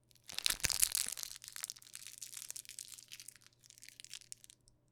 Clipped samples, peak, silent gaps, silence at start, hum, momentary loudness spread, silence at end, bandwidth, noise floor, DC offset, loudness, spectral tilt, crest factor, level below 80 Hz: under 0.1%; -2 dBFS; none; 0.3 s; none; 22 LU; 0.75 s; over 20 kHz; -64 dBFS; under 0.1%; -38 LUFS; 1 dB/octave; 40 dB; -66 dBFS